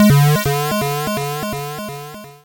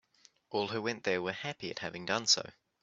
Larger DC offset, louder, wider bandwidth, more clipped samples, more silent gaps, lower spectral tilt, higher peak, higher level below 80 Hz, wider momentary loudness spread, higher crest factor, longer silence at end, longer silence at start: neither; first, -18 LUFS vs -33 LUFS; first, 17 kHz vs 8 kHz; neither; neither; first, -5.5 dB/octave vs -1.5 dB/octave; first, -4 dBFS vs -12 dBFS; first, -42 dBFS vs -76 dBFS; first, 16 LU vs 12 LU; second, 14 dB vs 24 dB; second, 0.1 s vs 0.3 s; second, 0 s vs 0.5 s